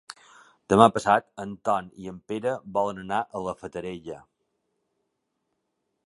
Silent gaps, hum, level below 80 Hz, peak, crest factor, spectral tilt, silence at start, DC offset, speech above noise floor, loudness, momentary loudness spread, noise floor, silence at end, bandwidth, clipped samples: none; none; -60 dBFS; -2 dBFS; 26 dB; -5.5 dB/octave; 0.1 s; under 0.1%; 53 dB; -25 LUFS; 22 LU; -79 dBFS; 1.9 s; 11.5 kHz; under 0.1%